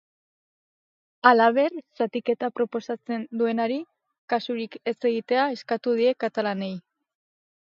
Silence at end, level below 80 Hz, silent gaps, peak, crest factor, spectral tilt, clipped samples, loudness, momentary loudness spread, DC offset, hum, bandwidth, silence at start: 0.95 s; -80 dBFS; 4.18-4.28 s; -2 dBFS; 24 dB; -6.5 dB/octave; under 0.1%; -25 LUFS; 12 LU; under 0.1%; none; 7 kHz; 1.25 s